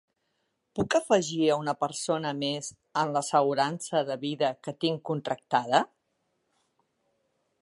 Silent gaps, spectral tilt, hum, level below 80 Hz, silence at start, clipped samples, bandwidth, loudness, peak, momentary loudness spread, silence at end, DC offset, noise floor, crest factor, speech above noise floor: none; -4.5 dB/octave; none; -68 dBFS; 0.75 s; under 0.1%; 11.5 kHz; -28 LUFS; -8 dBFS; 8 LU; 1.75 s; under 0.1%; -77 dBFS; 22 dB; 49 dB